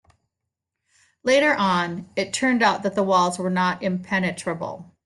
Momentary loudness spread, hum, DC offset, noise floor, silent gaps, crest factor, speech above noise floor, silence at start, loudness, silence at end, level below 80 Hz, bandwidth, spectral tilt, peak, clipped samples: 10 LU; none; under 0.1%; -83 dBFS; none; 16 dB; 61 dB; 1.25 s; -22 LUFS; 0.25 s; -64 dBFS; 12 kHz; -4.5 dB/octave; -6 dBFS; under 0.1%